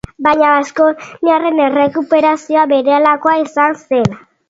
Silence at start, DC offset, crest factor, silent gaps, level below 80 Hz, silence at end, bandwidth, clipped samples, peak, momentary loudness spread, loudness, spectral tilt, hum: 0.2 s; under 0.1%; 12 dB; none; -48 dBFS; 0.3 s; 7.8 kHz; under 0.1%; 0 dBFS; 4 LU; -13 LUFS; -6 dB/octave; none